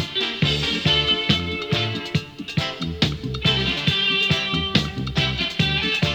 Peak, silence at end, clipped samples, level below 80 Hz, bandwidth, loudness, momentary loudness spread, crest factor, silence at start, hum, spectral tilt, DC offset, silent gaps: -2 dBFS; 0 s; under 0.1%; -38 dBFS; 19.5 kHz; -21 LUFS; 8 LU; 20 dB; 0 s; none; -4.5 dB/octave; under 0.1%; none